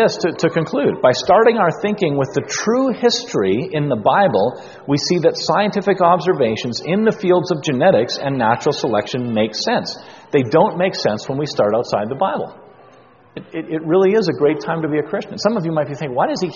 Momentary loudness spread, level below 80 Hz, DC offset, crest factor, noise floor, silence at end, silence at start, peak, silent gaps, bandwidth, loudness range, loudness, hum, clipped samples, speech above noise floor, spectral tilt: 8 LU; -56 dBFS; under 0.1%; 16 dB; -47 dBFS; 0 s; 0 s; 0 dBFS; none; 7.4 kHz; 3 LU; -17 LUFS; none; under 0.1%; 30 dB; -4.5 dB/octave